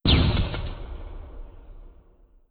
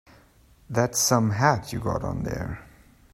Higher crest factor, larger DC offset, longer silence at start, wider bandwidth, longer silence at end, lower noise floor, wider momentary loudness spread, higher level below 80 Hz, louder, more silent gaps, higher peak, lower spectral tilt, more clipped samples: about the same, 18 dB vs 22 dB; neither; second, 0.05 s vs 0.7 s; second, 5 kHz vs 16 kHz; about the same, 0.6 s vs 0.5 s; about the same, -55 dBFS vs -56 dBFS; first, 25 LU vs 12 LU; first, -30 dBFS vs -46 dBFS; about the same, -25 LUFS vs -25 LUFS; neither; about the same, -8 dBFS vs -6 dBFS; first, -10.5 dB/octave vs -4.5 dB/octave; neither